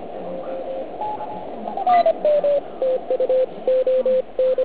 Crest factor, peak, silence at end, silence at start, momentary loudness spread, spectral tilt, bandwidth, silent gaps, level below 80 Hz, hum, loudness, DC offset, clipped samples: 12 dB; -8 dBFS; 0 s; 0 s; 13 LU; -9 dB/octave; 4 kHz; none; -58 dBFS; none; -21 LUFS; 1%; under 0.1%